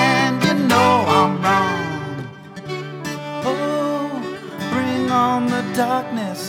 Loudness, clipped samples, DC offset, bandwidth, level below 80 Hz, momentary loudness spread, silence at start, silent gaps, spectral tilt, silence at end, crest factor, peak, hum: -19 LUFS; under 0.1%; under 0.1%; 17 kHz; -58 dBFS; 14 LU; 0 s; none; -5 dB/octave; 0 s; 16 dB; -2 dBFS; none